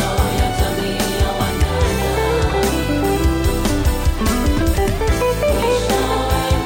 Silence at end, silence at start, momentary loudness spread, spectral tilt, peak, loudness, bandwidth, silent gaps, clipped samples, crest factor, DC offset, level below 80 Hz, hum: 0 s; 0 s; 2 LU; -5 dB/octave; -4 dBFS; -18 LUFS; 17 kHz; none; under 0.1%; 12 dB; under 0.1%; -22 dBFS; none